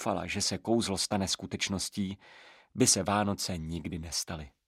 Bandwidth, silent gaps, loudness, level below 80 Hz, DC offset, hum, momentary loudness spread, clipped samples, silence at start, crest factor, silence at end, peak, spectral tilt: 15.5 kHz; none; -30 LUFS; -54 dBFS; under 0.1%; none; 13 LU; under 0.1%; 0 s; 20 dB; 0.2 s; -12 dBFS; -3.5 dB/octave